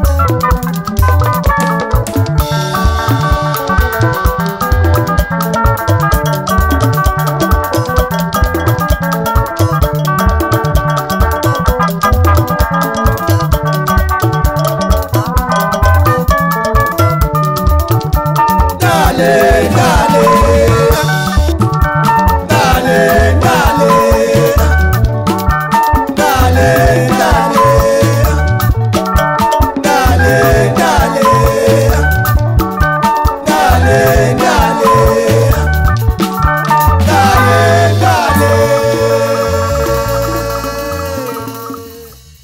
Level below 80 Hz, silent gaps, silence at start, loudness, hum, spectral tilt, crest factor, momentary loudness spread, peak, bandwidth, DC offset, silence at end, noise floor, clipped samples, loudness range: -18 dBFS; none; 0 s; -11 LUFS; none; -5.5 dB/octave; 10 dB; 5 LU; 0 dBFS; 16.5 kHz; 0.2%; 0.3 s; -34 dBFS; under 0.1%; 3 LU